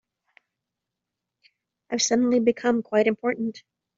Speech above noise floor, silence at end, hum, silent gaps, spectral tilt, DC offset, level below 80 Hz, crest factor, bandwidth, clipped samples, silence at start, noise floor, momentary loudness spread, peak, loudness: 62 dB; 0.4 s; none; none; -3.5 dB/octave; under 0.1%; -70 dBFS; 20 dB; 7.8 kHz; under 0.1%; 1.9 s; -85 dBFS; 10 LU; -6 dBFS; -23 LUFS